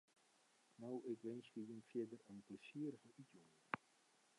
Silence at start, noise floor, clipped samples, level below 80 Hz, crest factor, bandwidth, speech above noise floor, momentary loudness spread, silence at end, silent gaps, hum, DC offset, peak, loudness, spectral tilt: 0.8 s; -77 dBFS; under 0.1%; under -90 dBFS; 28 dB; 11 kHz; 25 dB; 13 LU; 0.6 s; none; none; under 0.1%; -24 dBFS; -52 LUFS; -6.5 dB/octave